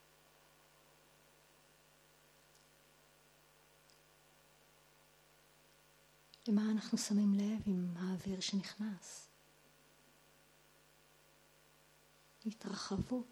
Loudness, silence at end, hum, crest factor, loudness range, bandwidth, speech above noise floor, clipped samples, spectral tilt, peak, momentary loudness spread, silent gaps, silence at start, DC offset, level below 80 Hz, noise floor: -39 LUFS; 0.05 s; none; 20 dB; 16 LU; 17.5 kHz; 30 dB; under 0.1%; -5.5 dB/octave; -24 dBFS; 15 LU; none; 6.45 s; under 0.1%; -70 dBFS; -68 dBFS